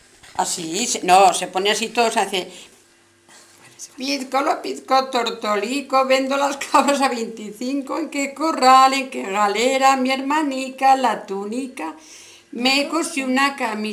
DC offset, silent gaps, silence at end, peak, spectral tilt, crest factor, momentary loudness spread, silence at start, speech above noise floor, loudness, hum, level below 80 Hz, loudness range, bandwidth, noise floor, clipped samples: under 0.1%; none; 0 s; 0 dBFS; -2 dB/octave; 20 dB; 14 LU; 0.35 s; 35 dB; -19 LUFS; none; -68 dBFS; 6 LU; 16 kHz; -55 dBFS; under 0.1%